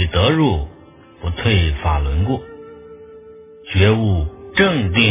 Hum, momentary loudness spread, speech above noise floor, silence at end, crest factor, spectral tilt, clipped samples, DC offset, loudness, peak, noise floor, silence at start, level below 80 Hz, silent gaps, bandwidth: none; 19 LU; 28 dB; 0 s; 18 dB; -10.5 dB/octave; under 0.1%; under 0.1%; -17 LUFS; 0 dBFS; -44 dBFS; 0 s; -26 dBFS; none; 3.9 kHz